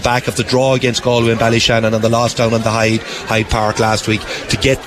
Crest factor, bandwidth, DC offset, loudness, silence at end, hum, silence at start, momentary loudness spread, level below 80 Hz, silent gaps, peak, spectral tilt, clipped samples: 12 dB; 14.5 kHz; under 0.1%; -14 LUFS; 0 s; none; 0 s; 5 LU; -34 dBFS; none; -2 dBFS; -4.5 dB/octave; under 0.1%